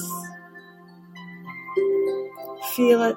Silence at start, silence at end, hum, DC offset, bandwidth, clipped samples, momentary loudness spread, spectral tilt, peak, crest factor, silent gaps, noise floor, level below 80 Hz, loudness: 0 s; 0 s; none; under 0.1%; 16.5 kHz; under 0.1%; 24 LU; -4.5 dB/octave; -6 dBFS; 20 dB; none; -47 dBFS; -74 dBFS; -24 LUFS